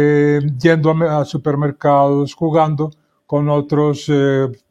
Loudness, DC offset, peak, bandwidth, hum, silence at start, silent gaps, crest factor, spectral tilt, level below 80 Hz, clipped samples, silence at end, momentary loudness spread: -16 LUFS; under 0.1%; 0 dBFS; 8.2 kHz; none; 0 s; none; 16 dB; -8 dB/octave; -56 dBFS; under 0.1%; 0.15 s; 6 LU